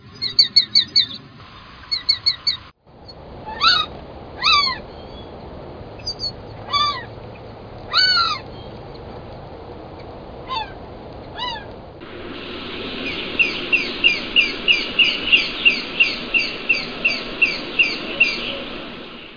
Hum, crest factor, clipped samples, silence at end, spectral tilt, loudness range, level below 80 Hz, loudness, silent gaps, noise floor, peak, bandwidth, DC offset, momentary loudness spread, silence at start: none; 20 dB; under 0.1%; 0 s; -2.5 dB/octave; 15 LU; -44 dBFS; -17 LUFS; none; -44 dBFS; -2 dBFS; 5.4 kHz; under 0.1%; 23 LU; 0 s